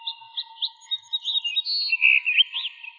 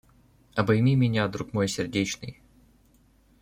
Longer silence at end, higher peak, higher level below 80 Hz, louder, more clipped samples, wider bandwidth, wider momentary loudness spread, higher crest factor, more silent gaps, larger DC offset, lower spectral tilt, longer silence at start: second, 0.05 s vs 1.1 s; about the same, -6 dBFS vs -8 dBFS; second, under -90 dBFS vs -56 dBFS; first, -21 LUFS vs -26 LUFS; neither; second, 7.2 kHz vs 15.5 kHz; first, 14 LU vs 11 LU; about the same, 18 dB vs 20 dB; neither; neither; second, 7.5 dB/octave vs -6 dB/octave; second, 0 s vs 0.55 s